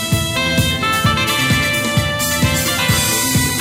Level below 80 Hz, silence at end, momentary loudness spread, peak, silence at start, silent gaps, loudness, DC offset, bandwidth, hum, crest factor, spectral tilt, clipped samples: -32 dBFS; 0 s; 2 LU; -4 dBFS; 0 s; none; -15 LUFS; under 0.1%; 16.5 kHz; none; 12 dB; -3 dB/octave; under 0.1%